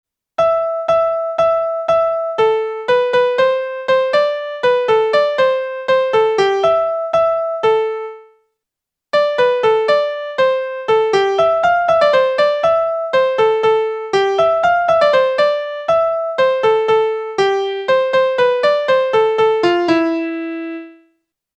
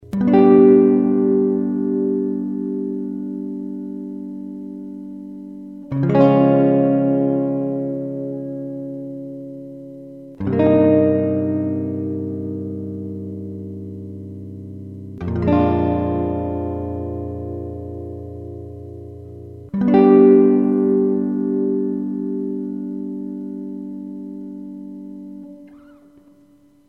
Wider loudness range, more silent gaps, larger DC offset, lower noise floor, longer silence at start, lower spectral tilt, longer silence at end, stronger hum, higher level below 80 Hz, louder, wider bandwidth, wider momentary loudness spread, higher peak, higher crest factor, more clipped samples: second, 3 LU vs 13 LU; neither; neither; first, -83 dBFS vs -52 dBFS; first, 0.4 s vs 0 s; second, -4.5 dB/octave vs -11 dB/octave; second, 0.7 s vs 1.1 s; neither; second, -56 dBFS vs -48 dBFS; first, -15 LUFS vs -18 LUFS; first, 8.8 kHz vs 5 kHz; second, 5 LU vs 21 LU; about the same, -2 dBFS vs -2 dBFS; about the same, 14 dB vs 18 dB; neither